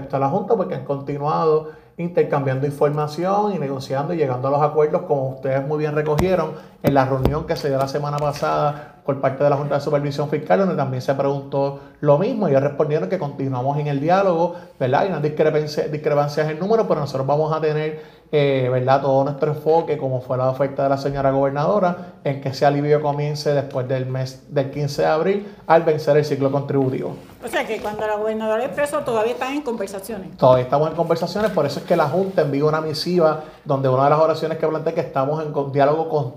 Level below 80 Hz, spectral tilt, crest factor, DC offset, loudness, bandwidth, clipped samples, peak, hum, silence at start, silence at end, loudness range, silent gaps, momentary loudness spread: -48 dBFS; -7 dB/octave; 20 dB; under 0.1%; -20 LUFS; 15.5 kHz; under 0.1%; 0 dBFS; none; 0 s; 0 s; 2 LU; none; 7 LU